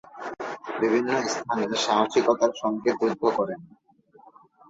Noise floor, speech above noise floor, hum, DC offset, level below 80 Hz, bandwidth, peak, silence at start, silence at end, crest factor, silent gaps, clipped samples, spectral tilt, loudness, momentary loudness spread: -55 dBFS; 31 dB; none; under 0.1%; -68 dBFS; 8 kHz; -8 dBFS; 0.15 s; 1.05 s; 18 dB; none; under 0.1%; -4 dB/octave; -25 LUFS; 13 LU